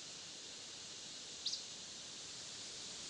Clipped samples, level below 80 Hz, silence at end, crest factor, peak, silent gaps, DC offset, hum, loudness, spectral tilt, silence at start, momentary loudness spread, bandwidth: under 0.1%; -80 dBFS; 0 s; 20 dB; -28 dBFS; none; under 0.1%; none; -46 LUFS; 0 dB/octave; 0 s; 7 LU; 12 kHz